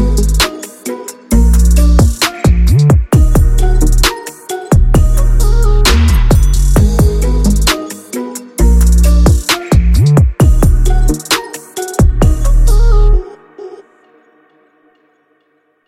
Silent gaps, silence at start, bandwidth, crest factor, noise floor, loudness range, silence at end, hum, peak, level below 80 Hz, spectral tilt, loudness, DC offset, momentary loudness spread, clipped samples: none; 0 s; 16 kHz; 10 dB; -57 dBFS; 4 LU; 2.15 s; none; 0 dBFS; -10 dBFS; -5.5 dB/octave; -11 LUFS; under 0.1%; 14 LU; under 0.1%